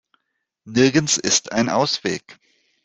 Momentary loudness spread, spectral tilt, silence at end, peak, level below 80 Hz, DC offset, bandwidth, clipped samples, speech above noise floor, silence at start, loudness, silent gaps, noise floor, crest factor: 9 LU; -3 dB/octave; 0.5 s; -2 dBFS; -58 dBFS; under 0.1%; 9.8 kHz; under 0.1%; 57 dB; 0.65 s; -19 LUFS; none; -76 dBFS; 20 dB